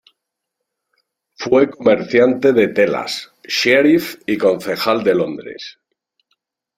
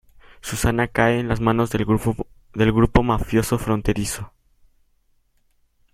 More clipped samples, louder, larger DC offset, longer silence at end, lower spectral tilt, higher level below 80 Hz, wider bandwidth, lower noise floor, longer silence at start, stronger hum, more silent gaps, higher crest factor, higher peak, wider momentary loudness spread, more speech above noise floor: neither; first, -16 LUFS vs -21 LUFS; neither; second, 1.05 s vs 1.65 s; about the same, -5 dB/octave vs -6 dB/octave; second, -58 dBFS vs -34 dBFS; about the same, 16 kHz vs 16 kHz; first, -78 dBFS vs -63 dBFS; first, 1.4 s vs 0.45 s; neither; neither; about the same, 16 dB vs 20 dB; about the same, 0 dBFS vs -2 dBFS; about the same, 15 LU vs 13 LU; first, 63 dB vs 43 dB